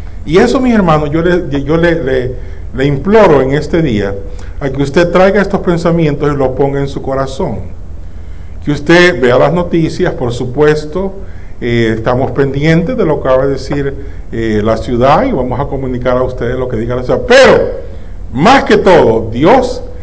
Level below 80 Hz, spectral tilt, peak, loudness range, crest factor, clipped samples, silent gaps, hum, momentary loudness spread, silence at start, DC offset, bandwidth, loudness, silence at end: -26 dBFS; -6.5 dB/octave; 0 dBFS; 4 LU; 12 dB; under 0.1%; none; none; 16 LU; 0 s; 6%; 8 kHz; -11 LUFS; 0 s